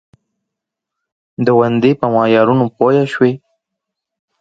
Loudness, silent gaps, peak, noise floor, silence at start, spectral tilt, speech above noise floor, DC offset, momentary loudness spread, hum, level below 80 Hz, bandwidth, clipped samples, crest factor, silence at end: -13 LUFS; none; 0 dBFS; -81 dBFS; 1.4 s; -8.5 dB/octave; 68 dB; under 0.1%; 7 LU; none; -58 dBFS; 7.8 kHz; under 0.1%; 16 dB; 1.05 s